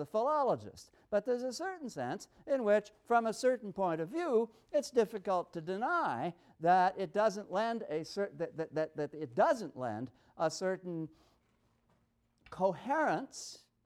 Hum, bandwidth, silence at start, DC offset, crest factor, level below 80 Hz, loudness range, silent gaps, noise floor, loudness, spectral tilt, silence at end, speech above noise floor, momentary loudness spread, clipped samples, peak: none; 14 kHz; 0 s; under 0.1%; 18 dB; -76 dBFS; 5 LU; none; -75 dBFS; -35 LUFS; -5 dB/octave; 0.3 s; 40 dB; 10 LU; under 0.1%; -16 dBFS